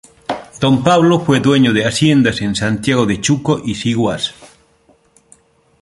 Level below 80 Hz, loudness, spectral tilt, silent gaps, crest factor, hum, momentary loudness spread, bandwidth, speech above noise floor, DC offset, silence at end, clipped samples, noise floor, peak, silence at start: -44 dBFS; -14 LUFS; -5.5 dB/octave; none; 16 dB; none; 9 LU; 11.5 kHz; 40 dB; under 0.1%; 1.35 s; under 0.1%; -53 dBFS; 0 dBFS; 0.3 s